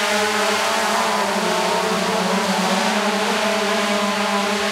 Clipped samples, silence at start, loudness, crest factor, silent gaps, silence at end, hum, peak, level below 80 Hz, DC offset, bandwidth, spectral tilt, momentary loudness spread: under 0.1%; 0 s; -19 LUFS; 14 dB; none; 0 s; none; -6 dBFS; -62 dBFS; under 0.1%; 16 kHz; -3 dB/octave; 1 LU